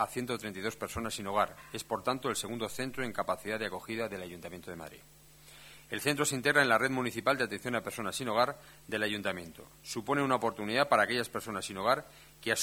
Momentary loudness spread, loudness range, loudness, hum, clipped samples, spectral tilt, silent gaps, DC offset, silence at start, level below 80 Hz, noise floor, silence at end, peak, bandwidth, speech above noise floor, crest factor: 17 LU; 7 LU; -32 LUFS; none; under 0.1%; -3.5 dB/octave; none; under 0.1%; 0 s; -64 dBFS; -55 dBFS; 0 s; -10 dBFS; over 20 kHz; 22 dB; 24 dB